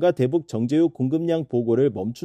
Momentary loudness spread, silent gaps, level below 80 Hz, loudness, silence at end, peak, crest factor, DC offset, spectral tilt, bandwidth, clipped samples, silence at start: 3 LU; none; -64 dBFS; -22 LUFS; 0.05 s; -8 dBFS; 14 dB; under 0.1%; -8.5 dB/octave; 9.4 kHz; under 0.1%; 0 s